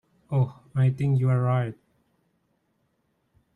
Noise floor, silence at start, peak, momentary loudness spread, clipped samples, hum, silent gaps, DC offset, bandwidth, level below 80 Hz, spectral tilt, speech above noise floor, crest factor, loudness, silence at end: -72 dBFS; 0.3 s; -12 dBFS; 6 LU; under 0.1%; none; none; under 0.1%; 4 kHz; -62 dBFS; -10 dB/octave; 49 dB; 16 dB; -25 LUFS; 1.85 s